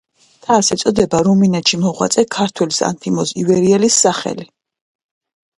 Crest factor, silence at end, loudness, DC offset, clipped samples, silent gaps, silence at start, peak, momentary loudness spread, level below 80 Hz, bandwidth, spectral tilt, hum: 16 dB; 1.15 s; -14 LUFS; under 0.1%; under 0.1%; none; 0.5 s; 0 dBFS; 7 LU; -50 dBFS; 11.5 kHz; -4 dB/octave; none